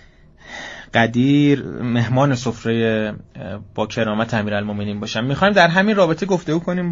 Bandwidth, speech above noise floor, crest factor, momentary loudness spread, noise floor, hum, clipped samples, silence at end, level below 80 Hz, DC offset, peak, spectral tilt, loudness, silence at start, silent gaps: 7.6 kHz; 27 dB; 18 dB; 17 LU; -45 dBFS; none; under 0.1%; 0 s; -48 dBFS; under 0.1%; 0 dBFS; -5 dB/octave; -18 LUFS; 0.45 s; none